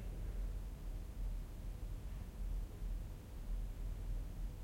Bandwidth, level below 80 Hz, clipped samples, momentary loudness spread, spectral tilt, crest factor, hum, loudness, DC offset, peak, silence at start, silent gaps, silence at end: 16.5 kHz; -44 dBFS; under 0.1%; 3 LU; -6.5 dB/octave; 10 dB; none; -49 LUFS; under 0.1%; -34 dBFS; 0 s; none; 0 s